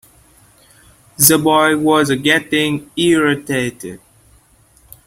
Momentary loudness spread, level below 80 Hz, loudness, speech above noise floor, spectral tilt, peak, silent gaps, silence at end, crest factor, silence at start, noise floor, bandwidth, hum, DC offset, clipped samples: 10 LU; -52 dBFS; -14 LUFS; 37 dB; -3.5 dB/octave; 0 dBFS; none; 1.1 s; 16 dB; 1.2 s; -51 dBFS; 16.5 kHz; none; under 0.1%; under 0.1%